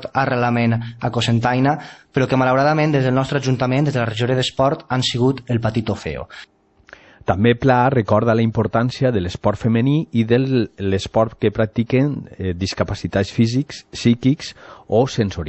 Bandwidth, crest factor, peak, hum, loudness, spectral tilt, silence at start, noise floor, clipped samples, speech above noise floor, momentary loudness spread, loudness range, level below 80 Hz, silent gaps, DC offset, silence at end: 8.4 kHz; 16 dB; -2 dBFS; none; -19 LUFS; -6.5 dB/octave; 0 s; -46 dBFS; under 0.1%; 28 dB; 8 LU; 3 LU; -44 dBFS; none; under 0.1%; 0 s